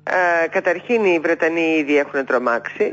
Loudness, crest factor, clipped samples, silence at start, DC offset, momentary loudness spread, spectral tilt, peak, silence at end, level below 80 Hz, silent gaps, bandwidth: -18 LUFS; 12 dB; under 0.1%; 0.05 s; under 0.1%; 4 LU; -5 dB/octave; -6 dBFS; 0 s; -68 dBFS; none; 7.8 kHz